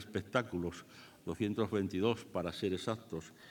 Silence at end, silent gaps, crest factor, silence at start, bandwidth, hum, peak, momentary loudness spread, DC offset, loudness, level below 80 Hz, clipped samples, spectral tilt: 0 s; none; 22 dB; 0 s; 19 kHz; none; -16 dBFS; 12 LU; under 0.1%; -37 LUFS; -70 dBFS; under 0.1%; -6 dB/octave